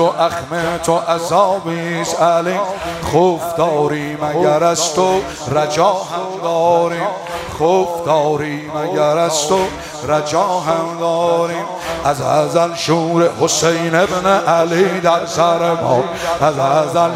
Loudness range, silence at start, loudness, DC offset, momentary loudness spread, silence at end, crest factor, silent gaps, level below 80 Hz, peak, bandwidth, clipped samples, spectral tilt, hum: 3 LU; 0 s; -16 LUFS; under 0.1%; 7 LU; 0 s; 16 dB; none; -46 dBFS; 0 dBFS; 16 kHz; under 0.1%; -4.5 dB/octave; none